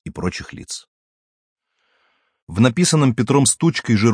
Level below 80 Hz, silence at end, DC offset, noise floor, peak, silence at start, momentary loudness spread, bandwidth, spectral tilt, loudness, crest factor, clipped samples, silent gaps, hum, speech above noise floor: -50 dBFS; 0 s; under 0.1%; -66 dBFS; -2 dBFS; 0.05 s; 17 LU; 10.5 kHz; -5 dB/octave; -17 LUFS; 18 dB; under 0.1%; 0.88-1.56 s, 2.42-2.47 s; none; 49 dB